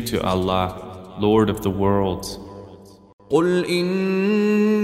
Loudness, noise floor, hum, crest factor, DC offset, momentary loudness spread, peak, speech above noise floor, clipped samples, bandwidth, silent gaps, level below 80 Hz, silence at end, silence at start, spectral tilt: -20 LUFS; -43 dBFS; none; 16 dB; under 0.1%; 18 LU; -6 dBFS; 24 dB; under 0.1%; 16 kHz; 3.13-3.18 s; -46 dBFS; 0 s; 0 s; -6.5 dB/octave